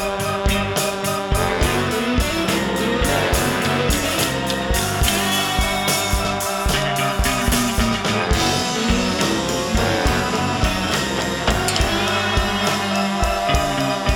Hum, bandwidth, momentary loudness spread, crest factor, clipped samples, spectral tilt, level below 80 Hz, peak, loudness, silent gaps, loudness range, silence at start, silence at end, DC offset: none; 19 kHz; 2 LU; 16 dB; under 0.1%; -3.5 dB/octave; -28 dBFS; -2 dBFS; -19 LUFS; none; 1 LU; 0 s; 0 s; under 0.1%